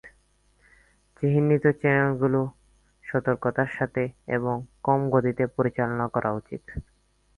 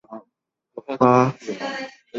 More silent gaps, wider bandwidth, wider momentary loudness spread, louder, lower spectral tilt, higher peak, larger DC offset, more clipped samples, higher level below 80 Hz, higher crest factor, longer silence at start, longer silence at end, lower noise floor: neither; first, 10.5 kHz vs 7.6 kHz; second, 12 LU vs 25 LU; second, -25 LUFS vs -20 LUFS; first, -10 dB/octave vs -7 dB/octave; second, -8 dBFS vs -2 dBFS; neither; neither; first, -52 dBFS vs -64 dBFS; about the same, 18 dB vs 22 dB; about the same, 0.05 s vs 0.1 s; first, 0.55 s vs 0 s; second, -64 dBFS vs -77 dBFS